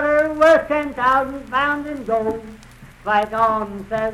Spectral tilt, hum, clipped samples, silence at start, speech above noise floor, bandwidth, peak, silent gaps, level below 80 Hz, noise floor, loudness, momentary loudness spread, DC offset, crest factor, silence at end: -5.5 dB/octave; none; under 0.1%; 0 s; 24 dB; 13 kHz; -2 dBFS; none; -46 dBFS; -42 dBFS; -19 LUFS; 11 LU; under 0.1%; 16 dB; 0 s